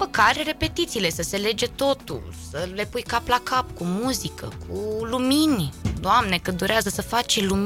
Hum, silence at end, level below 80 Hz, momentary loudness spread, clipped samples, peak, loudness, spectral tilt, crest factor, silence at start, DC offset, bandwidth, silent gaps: none; 0 s; -42 dBFS; 11 LU; under 0.1%; -6 dBFS; -23 LUFS; -4 dB/octave; 18 dB; 0 s; under 0.1%; 17 kHz; none